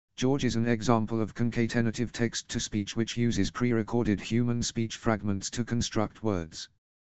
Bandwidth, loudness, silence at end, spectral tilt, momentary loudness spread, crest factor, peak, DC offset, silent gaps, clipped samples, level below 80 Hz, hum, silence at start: 8.4 kHz; -29 LUFS; 0.3 s; -5.5 dB/octave; 5 LU; 22 dB; -8 dBFS; 0.7%; none; under 0.1%; -50 dBFS; none; 0.1 s